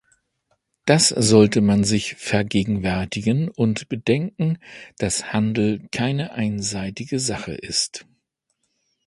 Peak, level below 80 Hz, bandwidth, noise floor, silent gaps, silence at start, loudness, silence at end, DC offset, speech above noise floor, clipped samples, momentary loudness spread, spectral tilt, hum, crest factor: 0 dBFS; -48 dBFS; 11.5 kHz; -74 dBFS; none; 0.85 s; -21 LUFS; 1.05 s; under 0.1%; 53 dB; under 0.1%; 12 LU; -4.5 dB/octave; none; 22 dB